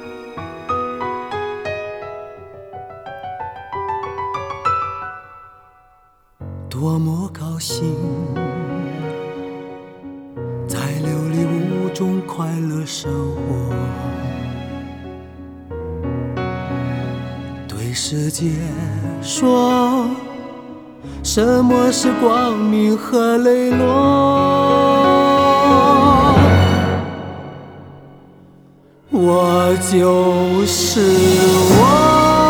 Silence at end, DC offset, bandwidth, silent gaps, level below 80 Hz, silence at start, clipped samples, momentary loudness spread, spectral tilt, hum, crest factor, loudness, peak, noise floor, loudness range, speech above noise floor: 0 s; under 0.1%; over 20 kHz; none; -40 dBFS; 0 s; under 0.1%; 21 LU; -5.5 dB/octave; none; 16 dB; -16 LUFS; 0 dBFS; -53 dBFS; 13 LU; 38 dB